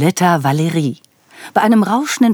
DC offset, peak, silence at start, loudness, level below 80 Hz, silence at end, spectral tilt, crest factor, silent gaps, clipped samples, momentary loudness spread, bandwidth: under 0.1%; 0 dBFS; 0 s; -15 LUFS; -78 dBFS; 0 s; -5.5 dB/octave; 14 dB; none; under 0.1%; 8 LU; over 20 kHz